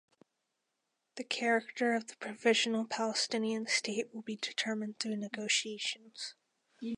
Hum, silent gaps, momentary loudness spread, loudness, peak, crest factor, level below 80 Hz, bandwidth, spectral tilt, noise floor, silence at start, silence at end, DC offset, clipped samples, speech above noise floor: none; none; 14 LU; -34 LUFS; -14 dBFS; 20 dB; -90 dBFS; 11 kHz; -2.5 dB/octave; -84 dBFS; 1.15 s; 0 s; under 0.1%; under 0.1%; 50 dB